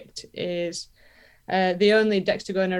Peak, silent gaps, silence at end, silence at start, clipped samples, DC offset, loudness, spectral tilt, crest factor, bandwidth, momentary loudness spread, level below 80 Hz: -8 dBFS; none; 0 s; 0 s; under 0.1%; under 0.1%; -23 LUFS; -5 dB/octave; 16 dB; 11.5 kHz; 17 LU; -62 dBFS